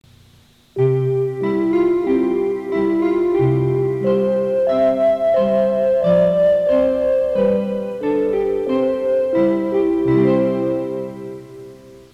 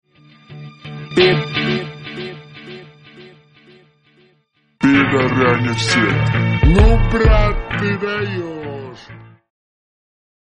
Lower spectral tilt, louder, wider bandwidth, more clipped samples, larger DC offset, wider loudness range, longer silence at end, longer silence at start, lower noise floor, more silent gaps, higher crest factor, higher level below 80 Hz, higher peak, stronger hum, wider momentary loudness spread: first, -9 dB/octave vs -6 dB/octave; about the same, -17 LUFS vs -16 LUFS; second, 7.8 kHz vs 10 kHz; neither; neither; second, 3 LU vs 10 LU; second, 0.15 s vs 1.35 s; first, 0.75 s vs 0.5 s; second, -51 dBFS vs -60 dBFS; neither; about the same, 12 dB vs 16 dB; second, -48 dBFS vs -24 dBFS; second, -6 dBFS vs 0 dBFS; neither; second, 8 LU vs 22 LU